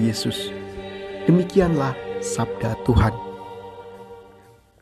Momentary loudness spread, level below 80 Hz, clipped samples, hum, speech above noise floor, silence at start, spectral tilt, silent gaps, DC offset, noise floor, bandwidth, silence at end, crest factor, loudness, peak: 20 LU; -36 dBFS; under 0.1%; none; 31 dB; 0 s; -6 dB/octave; none; under 0.1%; -51 dBFS; 13 kHz; 0.55 s; 20 dB; -22 LUFS; -4 dBFS